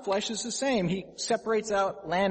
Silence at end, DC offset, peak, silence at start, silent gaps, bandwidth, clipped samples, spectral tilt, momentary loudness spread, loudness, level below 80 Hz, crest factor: 0 s; under 0.1%; -14 dBFS; 0 s; none; 8.8 kHz; under 0.1%; -4 dB/octave; 4 LU; -29 LUFS; -60 dBFS; 16 dB